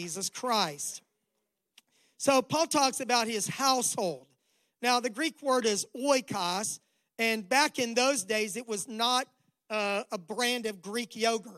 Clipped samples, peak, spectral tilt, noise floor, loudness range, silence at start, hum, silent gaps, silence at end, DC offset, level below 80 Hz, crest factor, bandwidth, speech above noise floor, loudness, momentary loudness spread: under 0.1%; -10 dBFS; -2 dB/octave; -82 dBFS; 2 LU; 0 s; none; none; 0 s; under 0.1%; -80 dBFS; 20 dB; 16 kHz; 52 dB; -29 LUFS; 10 LU